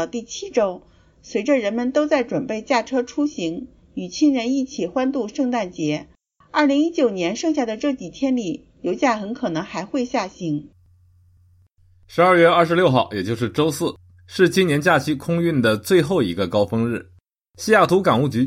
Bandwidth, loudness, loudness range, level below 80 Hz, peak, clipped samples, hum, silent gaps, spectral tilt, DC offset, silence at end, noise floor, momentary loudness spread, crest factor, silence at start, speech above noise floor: 16 kHz; -20 LUFS; 5 LU; -56 dBFS; -2 dBFS; under 0.1%; none; none; -5.5 dB/octave; under 0.1%; 0 s; -55 dBFS; 11 LU; 18 dB; 0 s; 36 dB